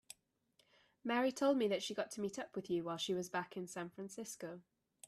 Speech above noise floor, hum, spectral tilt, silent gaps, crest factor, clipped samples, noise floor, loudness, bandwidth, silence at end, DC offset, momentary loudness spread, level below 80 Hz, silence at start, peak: 38 dB; none; -4 dB/octave; none; 18 dB; under 0.1%; -78 dBFS; -40 LUFS; 14 kHz; 0.5 s; under 0.1%; 15 LU; -84 dBFS; 1.05 s; -24 dBFS